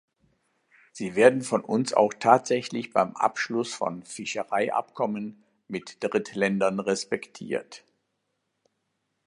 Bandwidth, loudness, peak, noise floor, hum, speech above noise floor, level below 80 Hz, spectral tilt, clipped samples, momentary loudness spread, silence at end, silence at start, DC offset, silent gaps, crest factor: 11 kHz; -26 LUFS; -2 dBFS; -78 dBFS; none; 52 dB; -72 dBFS; -4.5 dB/octave; under 0.1%; 15 LU; 1.5 s; 0.95 s; under 0.1%; none; 24 dB